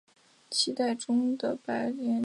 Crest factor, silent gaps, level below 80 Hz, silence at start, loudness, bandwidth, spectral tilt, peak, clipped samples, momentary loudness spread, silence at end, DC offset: 16 dB; none; -80 dBFS; 0.5 s; -30 LUFS; 11.5 kHz; -3 dB/octave; -14 dBFS; under 0.1%; 5 LU; 0 s; under 0.1%